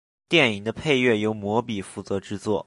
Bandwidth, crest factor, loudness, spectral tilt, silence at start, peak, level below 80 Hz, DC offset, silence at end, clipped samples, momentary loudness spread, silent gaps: 11.5 kHz; 20 dB; -23 LUFS; -5 dB/octave; 0.3 s; -4 dBFS; -54 dBFS; under 0.1%; 0.05 s; under 0.1%; 11 LU; none